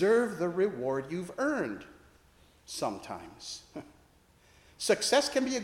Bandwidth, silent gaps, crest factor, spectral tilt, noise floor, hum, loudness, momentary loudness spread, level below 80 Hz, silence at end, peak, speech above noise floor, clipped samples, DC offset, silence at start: 16.5 kHz; none; 20 dB; -3.5 dB/octave; -63 dBFS; none; -31 LUFS; 17 LU; -66 dBFS; 0 s; -12 dBFS; 32 dB; under 0.1%; under 0.1%; 0 s